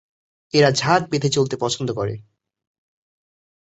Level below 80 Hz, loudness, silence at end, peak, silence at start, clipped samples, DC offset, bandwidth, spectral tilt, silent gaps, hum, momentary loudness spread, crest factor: -56 dBFS; -20 LUFS; 1.4 s; -2 dBFS; 0.55 s; under 0.1%; under 0.1%; 8.2 kHz; -4.5 dB/octave; none; none; 10 LU; 20 dB